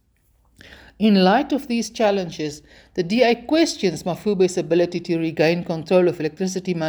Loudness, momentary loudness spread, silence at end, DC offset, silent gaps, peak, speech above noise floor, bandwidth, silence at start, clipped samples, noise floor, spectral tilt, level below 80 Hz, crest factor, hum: -20 LUFS; 9 LU; 0 s; under 0.1%; none; -4 dBFS; 41 dB; over 20 kHz; 1 s; under 0.1%; -61 dBFS; -5.5 dB/octave; -56 dBFS; 16 dB; none